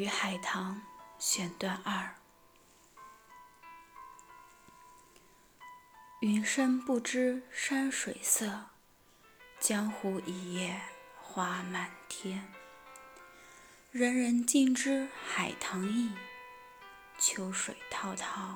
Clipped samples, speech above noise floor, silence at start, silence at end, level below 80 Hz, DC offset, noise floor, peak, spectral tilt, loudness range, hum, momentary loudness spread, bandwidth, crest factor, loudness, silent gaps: under 0.1%; 30 dB; 0 s; 0 s; -74 dBFS; under 0.1%; -64 dBFS; -14 dBFS; -3 dB/octave; 9 LU; none; 23 LU; over 20 kHz; 22 dB; -33 LUFS; none